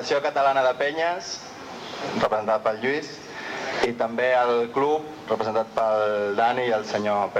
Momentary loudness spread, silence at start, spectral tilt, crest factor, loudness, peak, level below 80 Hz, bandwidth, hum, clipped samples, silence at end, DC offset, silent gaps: 12 LU; 0 s; -4 dB/octave; 16 dB; -24 LUFS; -8 dBFS; -64 dBFS; 12.5 kHz; none; under 0.1%; 0 s; under 0.1%; none